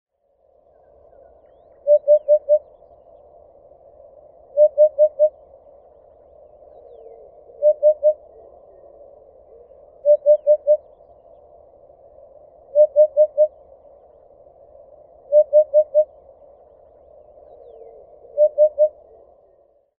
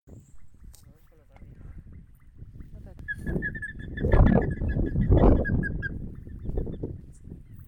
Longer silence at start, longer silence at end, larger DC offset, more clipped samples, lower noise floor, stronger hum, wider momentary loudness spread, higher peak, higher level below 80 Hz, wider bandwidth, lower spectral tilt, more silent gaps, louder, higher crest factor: first, 1.85 s vs 0.1 s; first, 1.1 s vs 0.05 s; neither; neither; first, -61 dBFS vs -54 dBFS; neither; second, 6 LU vs 26 LU; first, -4 dBFS vs -8 dBFS; second, -64 dBFS vs -30 dBFS; second, 1.1 kHz vs 9 kHz; about the same, -8.5 dB/octave vs -9.5 dB/octave; neither; first, -17 LUFS vs -27 LUFS; about the same, 16 dB vs 20 dB